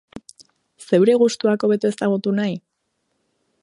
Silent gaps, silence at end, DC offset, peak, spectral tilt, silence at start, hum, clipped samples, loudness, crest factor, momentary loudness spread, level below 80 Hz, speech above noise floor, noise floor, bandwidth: none; 1.05 s; under 0.1%; -4 dBFS; -6 dB/octave; 0.15 s; none; under 0.1%; -19 LUFS; 16 dB; 8 LU; -66 dBFS; 55 dB; -73 dBFS; 11.5 kHz